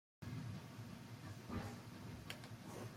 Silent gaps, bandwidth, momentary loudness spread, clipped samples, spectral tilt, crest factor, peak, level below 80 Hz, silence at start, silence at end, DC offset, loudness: none; 16.5 kHz; 5 LU; under 0.1%; -5.5 dB/octave; 22 dB; -30 dBFS; -68 dBFS; 0.2 s; 0 s; under 0.1%; -52 LUFS